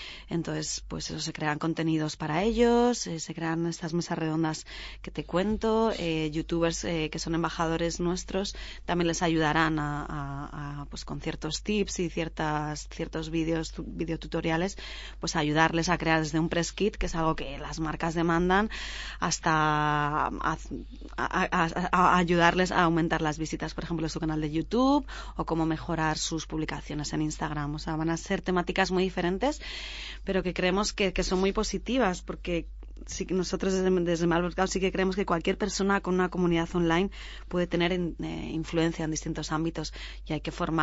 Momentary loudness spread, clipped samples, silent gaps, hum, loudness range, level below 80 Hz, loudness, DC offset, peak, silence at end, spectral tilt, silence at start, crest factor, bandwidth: 11 LU; under 0.1%; none; none; 5 LU; -42 dBFS; -29 LUFS; under 0.1%; -6 dBFS; 0 s; -5 dB/octave; 0 s; 22 dB; 8 kHz